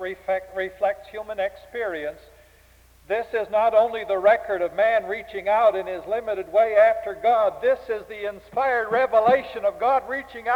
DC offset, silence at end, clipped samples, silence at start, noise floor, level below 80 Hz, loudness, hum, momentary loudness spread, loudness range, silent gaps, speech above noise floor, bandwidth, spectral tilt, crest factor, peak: under 0.1%; 0 s; under 0.1%; 0 s; -54 dBFS; -58 dBFS; -23 LUFS; none; 12 LU; 5 LU; none; 32 dB; 17 kHz; -5 dB/octave; 18 dB; -6 dBFS